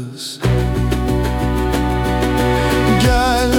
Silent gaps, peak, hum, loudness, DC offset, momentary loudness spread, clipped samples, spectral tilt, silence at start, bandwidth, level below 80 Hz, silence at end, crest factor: none; -2 dBFS; none; -16 LUFS; under 0.1%; 5 LU; under 0.1%; -5.5 dB/octave; 0 s; 18 kHz; -22 dBFS; 0 s; 12 dB